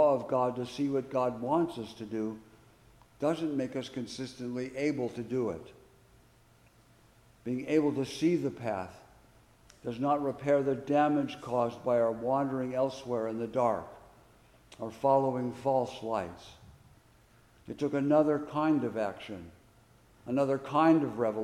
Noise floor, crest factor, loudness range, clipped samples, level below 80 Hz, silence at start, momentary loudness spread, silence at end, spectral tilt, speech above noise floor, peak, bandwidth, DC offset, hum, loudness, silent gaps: -62 dBFS; 20 dB; 6 LU; under 0.1%; -66 dBFS; 0 s; 14 LU; 0 s; -7 dB/octave; 31 dB; -12 dBFS; 13 kHz; under 0.1%; none; -31 LUFS; none